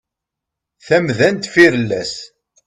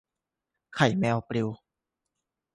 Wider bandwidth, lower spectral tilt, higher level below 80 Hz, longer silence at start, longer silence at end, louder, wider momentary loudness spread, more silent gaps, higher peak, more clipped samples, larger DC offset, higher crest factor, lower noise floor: about the same, 11 kHz vs 11.5 kHz; about the same, -5 dB/octave vs -6 dB/octave; first, -56 dBFS vs -64 dBFS; about the same, 0.85 s vs 0.75 s; second, 0.4 s vs 1 s; first, -14 LUFS vs -27 LUFS; second, 13 LU vs 16 LU; neither; first, 0 dBFS vs -8 dBFS; neither; neither; second, 16 dB vs 24 dB; second, -82 dBFS vs -87 dBFS